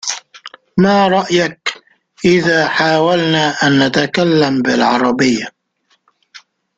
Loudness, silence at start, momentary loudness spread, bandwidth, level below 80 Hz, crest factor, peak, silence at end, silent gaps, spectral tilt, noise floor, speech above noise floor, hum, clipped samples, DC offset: -13 LUFS; 0.05 s; 10 LU; 9.2 kHz; -52 dBFS; 14 dB; 0 dBFS; 0.4 s; none; -4.5 dB/octave; -61 dBFS; 48 dB; none; under 0.1%; under 0.1%